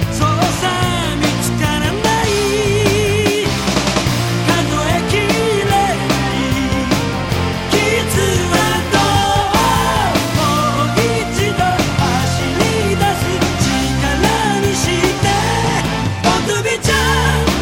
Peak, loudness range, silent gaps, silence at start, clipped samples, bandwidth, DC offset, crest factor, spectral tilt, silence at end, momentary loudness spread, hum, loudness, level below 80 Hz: -2 dBFS; 1 LU; none; 0 s; under 0.1%; 17 kHz; under 0.1%; 12 dB; -4.5 dB/octave; 0 s; 3 LU; none; -15 LUFS; -28 dBFS